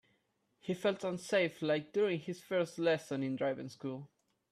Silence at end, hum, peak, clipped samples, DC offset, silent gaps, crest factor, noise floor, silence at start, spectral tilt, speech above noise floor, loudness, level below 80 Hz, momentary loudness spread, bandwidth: 0.45 s; none; -20 dBFS; under 0.1%; under 0.1%; none; 16 dB; -78 dBFS; 0.65 s; -5.5 dB/octave; 43 dB; -35 LUFS; -80 dBFS; 10 LU; 14 kHz